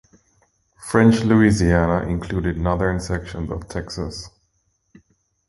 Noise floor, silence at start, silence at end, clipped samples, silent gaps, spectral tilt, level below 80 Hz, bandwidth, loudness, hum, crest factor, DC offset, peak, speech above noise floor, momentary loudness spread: -68 dBFS; 0.8 s; 1.2 s; under 0.1%; none; -6.5 dB/octave; -34 dBFS; 11.5 kHz; -20 LUFS; none; 18 dB; under 0.1%; -2 dBFS; 49 dB; 15 LU